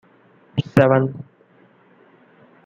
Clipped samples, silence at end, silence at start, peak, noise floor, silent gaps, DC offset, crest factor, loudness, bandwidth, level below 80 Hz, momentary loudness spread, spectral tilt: under 0.1%; 1.45 s; 0.55 s; -2 dBFS; -54 dBFS; none; under 0.1%; 20 dB; -19 LUFS; 11 kHz; -56 dBFS; 14 LU; -8.5 dB/octave